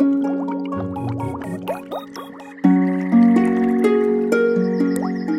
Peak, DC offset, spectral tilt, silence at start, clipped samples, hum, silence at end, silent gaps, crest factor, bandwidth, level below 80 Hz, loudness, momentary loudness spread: -2 dBFS; under 0.1%; -8 dB/octave; 0 s; under 0.1%; none; 0 s; none; 16 dB; 13.5 kHz; -56 dBFS; -19 LUFS; 14 LU